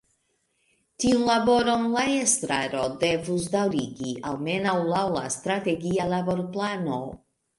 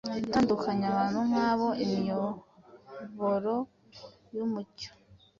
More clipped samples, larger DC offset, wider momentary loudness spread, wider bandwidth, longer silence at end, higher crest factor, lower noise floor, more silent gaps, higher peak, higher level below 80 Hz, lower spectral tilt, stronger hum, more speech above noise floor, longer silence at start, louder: neither; neither; second, 9 LU vs 18 LU; first, 11.5 kHz vs 7.4 kHz; first, 0.45 s vs 0.25 s; about the same, 20 dB vs 18 dB; first, -72 dBFS vs -52 dBFS; neither; first, -6 dBFS vs -14 dBFS; first, -56 dBFS vs -64 dBFS; second, -4 dB/octave vs -6.5 dB/octave; neither; first, 47 dB vs 23 dB; first, 1 s vs 0.05 s; first, -25 LUFS vs -30 LUFS